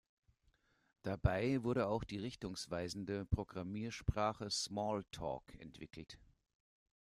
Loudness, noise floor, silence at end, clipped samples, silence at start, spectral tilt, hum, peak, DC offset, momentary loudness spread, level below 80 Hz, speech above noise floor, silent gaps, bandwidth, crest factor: -41 LUFS; -77 dBFS; 0.85 s; under 0.1%; 1.05 s; -5.5 dB/octave; none; -20 dBFS; under 0.1%; 17 LU; -54 dBFS; 36 dB; none; 14.5 kHz; 22 dB